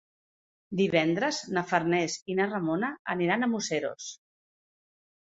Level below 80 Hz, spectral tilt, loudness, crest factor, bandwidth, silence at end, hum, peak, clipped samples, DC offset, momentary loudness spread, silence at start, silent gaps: -72 dBFS; -4.5 dB/octave; -28 LUFS; 22 dB; 8 kHz; 1.25 s; none; -8 dBFS; under 0.1%; under 0.1%; 8 LU; 0.7 s; 2.22-2.26 s, 2.99-3.05 s